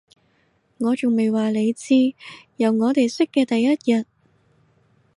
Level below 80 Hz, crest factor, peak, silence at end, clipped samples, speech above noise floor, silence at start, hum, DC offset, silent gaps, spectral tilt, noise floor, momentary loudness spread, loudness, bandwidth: -72 dBFS; 14 dB; -8 dBFS; 1.15 s; under 0.1%; 44 dB; 0.8 s; none; under 0.1%; none; -5.5 dB/octave; -64 dBFS; 6 LU; -20 LUFS; 11.5 kHz